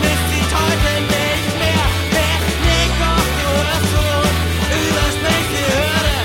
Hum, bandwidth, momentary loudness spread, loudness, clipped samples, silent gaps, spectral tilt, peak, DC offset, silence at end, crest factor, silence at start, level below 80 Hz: none; 16.5 kHz; 1 LU; -16 LUFS; under 0.1%; none; -4 dB/octave; -2 dBFS; under 0.1%; 0 s; 12 dB; 0 s; -24 dBFS